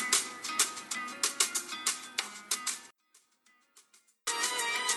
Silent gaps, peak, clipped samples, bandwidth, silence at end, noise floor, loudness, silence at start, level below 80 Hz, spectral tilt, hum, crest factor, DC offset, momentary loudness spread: none; -8 dBFS; under 0.1%; over 20 kHz; 0 s; -69 dBFS; -32 LUFS; 0 s; -86 dBFS; 2 dB/octave; none; 26 dB; under 0.1%; 8 LU